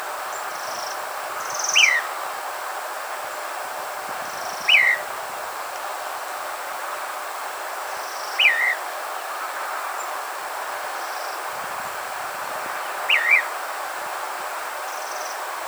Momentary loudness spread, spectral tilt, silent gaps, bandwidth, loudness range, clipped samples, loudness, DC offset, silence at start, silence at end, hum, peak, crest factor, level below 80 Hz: 14 LU; 1.5 dB/octave; none; over 20 kHz; 6 LU; under 0.1%; -24 LUFS; under 0.1%; 0 s; 0 s; none; -4 dBFS; 22 dB; -74 dBFS